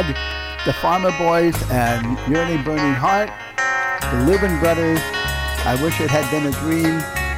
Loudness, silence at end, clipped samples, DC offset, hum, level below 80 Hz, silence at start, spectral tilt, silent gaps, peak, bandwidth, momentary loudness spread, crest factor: -19 LUFS; 0 s; under 0.1%; under 0.1%; none; -32 dBFS; 0 s; -5 dB/octave; none; -6 dBFS; 16.5 kHz; 5 LU; 14 dB